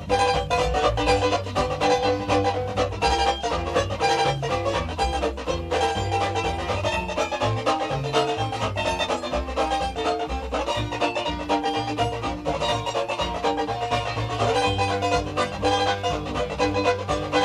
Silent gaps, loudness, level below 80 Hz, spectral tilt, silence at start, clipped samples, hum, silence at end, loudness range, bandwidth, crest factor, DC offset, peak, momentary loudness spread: none; -24 LUFS; -38 dBFS; -4.5 dB/octave; 0 s; under 0.1%; none; 0 s; 3 LU; 13.5 kHz; 18 dB; under 0.1%; -6 dBFS; 5 LU